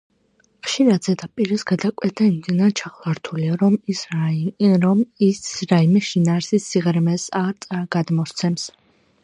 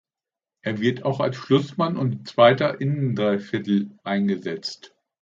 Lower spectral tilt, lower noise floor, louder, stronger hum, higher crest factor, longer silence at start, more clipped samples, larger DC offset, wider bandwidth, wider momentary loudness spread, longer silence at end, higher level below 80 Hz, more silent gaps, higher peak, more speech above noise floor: about the same, -6 dB/octave vs -7 dB/octave; second, -62 dBFS vs under -90 dBFS; first, -20 LUFS vs -23 LUFS; neither; about the same, 18 dB vs 20 dB; about the same, 0.65 s vs 0.65 s; neither; neither; first, 10.5 kHz vs 7.6 kHz; second, 9 LU vs 13 LU; first, 0.55 s vs 0.35 s; about the same, -64 dBFS vs -66 dBFS; neither; about the same, -2 dBFS vs -2 dBFS; second, 43 dB vs over 68 dB